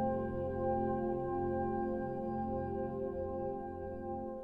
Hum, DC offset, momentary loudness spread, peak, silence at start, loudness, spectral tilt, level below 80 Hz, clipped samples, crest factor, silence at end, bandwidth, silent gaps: none; under 0.1%; 7 LU; -24 dBFS; 0 s; -38 LUFS; -11 dB/octave; -54 dBFS; under 0.1%; 12 dB; 0 s; 3.4 kHz; none